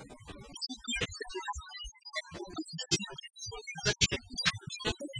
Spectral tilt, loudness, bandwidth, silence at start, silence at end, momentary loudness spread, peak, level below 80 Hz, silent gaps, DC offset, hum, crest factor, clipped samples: -2.5 dB/octave; -35 LUFS; 10.5 kHz; 0 s; 0 s; 14 LU; -12 dBFS; -52 dBFS; none; under 0.1%; none; 26 dB; under 0.1%